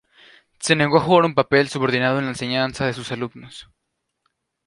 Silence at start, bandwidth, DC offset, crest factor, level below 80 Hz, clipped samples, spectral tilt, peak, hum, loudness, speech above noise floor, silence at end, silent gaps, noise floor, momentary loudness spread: 0.6 s; 11.5 kHz; under 0.1%; 20 dB; -56 dBFS; under 0.1%; -5 dB/octave; -2 dBFS; none; -19 LUFS; 57 dB; 1.05 s; none; -77 dBFS; 13 LU